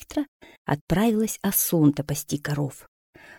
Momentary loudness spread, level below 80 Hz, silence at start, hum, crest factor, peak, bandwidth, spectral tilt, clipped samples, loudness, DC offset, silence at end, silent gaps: 11 LU; -48 dBFS; 0 s; none; 18 dB; -6 dBFS; 18.5 kHz; -5.5 dB/octave; under 0.1%; -24 LUFS; under 0.1%; 0.05 s; 0.28-0.40 s, 0.58-0.65 s, 0.81-0.87 s, 2.88-3.13 s